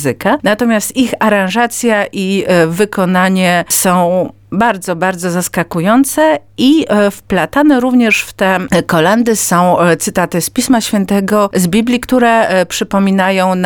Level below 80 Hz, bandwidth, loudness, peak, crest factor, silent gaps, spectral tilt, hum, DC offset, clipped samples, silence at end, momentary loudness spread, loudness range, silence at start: -44 dBFS; 19 kHz; -12 LUFS; 0 dBFS; 10 dB; none; -4.5 dB/octave; none; under 0.1%; under 0.1%; 0 s; 5 LU; 2 LU; 0 s